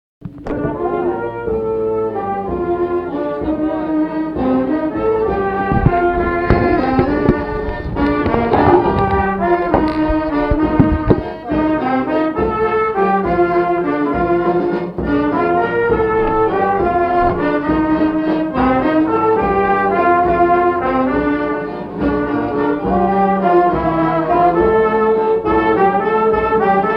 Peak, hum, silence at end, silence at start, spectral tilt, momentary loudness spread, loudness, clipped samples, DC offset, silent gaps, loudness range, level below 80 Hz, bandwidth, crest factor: 0 dBFS; none; 0 s; 0.2 s; -9.5 dB/octave; 7 LU; -16 LUFS; under 0.1%; under 0.1%; none; 4 LU; -32 dBFS; 5.6 kHz; 14 dB